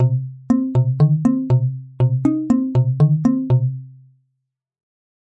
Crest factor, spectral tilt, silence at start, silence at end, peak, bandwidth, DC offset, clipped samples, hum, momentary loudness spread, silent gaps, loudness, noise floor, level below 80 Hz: 14 dB; -10.5 dB/octave; 0 s; 1.4 s; -4 dBFS; 6 kHz; under 0.1%; under 0.1%; none; 6 LU; none; -18 LUFS; -75 dBFS; -50 dBFS